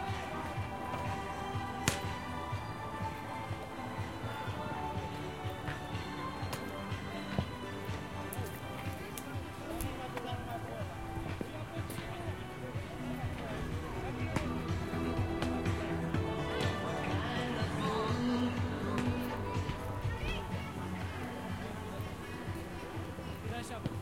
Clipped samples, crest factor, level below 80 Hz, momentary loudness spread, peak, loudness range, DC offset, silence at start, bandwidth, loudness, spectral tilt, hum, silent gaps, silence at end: under 0.1%; 32 dB; -52 dBFS; 7 LU; -6 dBFS; 6 LU; 0.1%; 0 s; 16.5 kHz; -38 LUFS; -5.5 dB/octave; none; none; 0 s